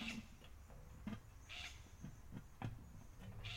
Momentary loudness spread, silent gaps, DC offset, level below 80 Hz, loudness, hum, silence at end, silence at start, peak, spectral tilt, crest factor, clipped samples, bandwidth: 10 LU; none; under 0.1%; -60 dBFS; -54 LUFS; none; 0 s; 0 s; -34 dBFS; -4.5 dB/octave; 20 dB; under 0.1%; 16.5 kHz